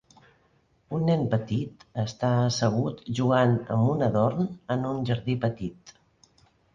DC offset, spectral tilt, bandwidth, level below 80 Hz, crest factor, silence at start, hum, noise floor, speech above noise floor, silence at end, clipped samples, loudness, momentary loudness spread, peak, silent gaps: under 0.1%; -7 dB/octave; 7.4 kHz; -56 dBFS; 18 dB; 0.9 s; none; -65 dBFS; 40 dB; 0.85 s; under 0.1%; -26 LUFS; 9 LU; -10 dBFS; none